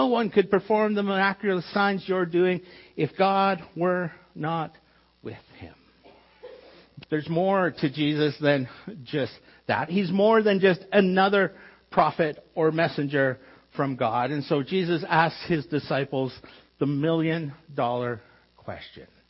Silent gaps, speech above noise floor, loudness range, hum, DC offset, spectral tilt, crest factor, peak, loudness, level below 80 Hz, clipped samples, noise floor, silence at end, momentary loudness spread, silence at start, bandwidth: none; 30 dB; 7 LU; none; under 0.1%; -10 dB/octave; 18 dB; -6 dBFS; -25 LUFS; -64 dBFS; under 0.1%; -55 dBFS; 0.25 s; 16 LU; 0 s; 5.8 kHz